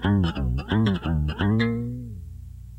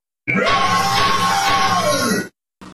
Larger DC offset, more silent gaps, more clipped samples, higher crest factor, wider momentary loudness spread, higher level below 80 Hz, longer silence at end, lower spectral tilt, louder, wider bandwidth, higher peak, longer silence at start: neither; neither; neither; about the same, 14 dB vs 12 dB; first, 16 LU vs 5 LU; first, -34 dBFS vs -42 dBFS; about the same, 0 s vs 0 s; first, -8.5 dB/octave vs -3 dB/octave; second, -25 LUFS vs -16 LUFS; second, 8.6 kHz vs 15.5 kHz; second, -10 dBFS vs -6 dBFS; second, 0 s vs 0.25 s